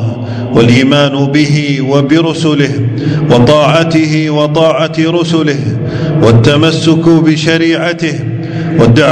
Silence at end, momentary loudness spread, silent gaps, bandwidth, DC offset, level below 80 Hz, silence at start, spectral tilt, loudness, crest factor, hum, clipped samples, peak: 0 s; 8 LU; none; 11 kHz; under 0.1%; -38 dBFS; 0 s; -6.5 dB/octave; -9 LUFS; 8 dB; none; 3%; 0 dBFS